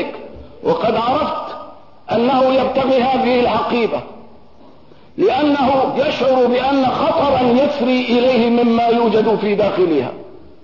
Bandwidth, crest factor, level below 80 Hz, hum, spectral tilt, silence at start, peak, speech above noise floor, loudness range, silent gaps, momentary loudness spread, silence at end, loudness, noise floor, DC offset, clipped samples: 6 kHz; 10 dB; -48 dBFS; none; -7 dB/octave; 0 s; -4 dBFS; 31 dB; 3 LU; none; 10 LU; 0.35 s; -15 LUFS; -45 dBFS; 0.5%; under 0.1%